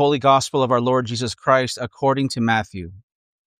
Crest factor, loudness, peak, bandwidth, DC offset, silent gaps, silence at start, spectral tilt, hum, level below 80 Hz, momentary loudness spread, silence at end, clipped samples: 18 dB; -19 LUFS; -2 dBFS; 15 kHz; under 0.1%; none; 0 s; -5 dB/octave; none; -56 dBFS; 11 LU; 0.6 s; under 0.1%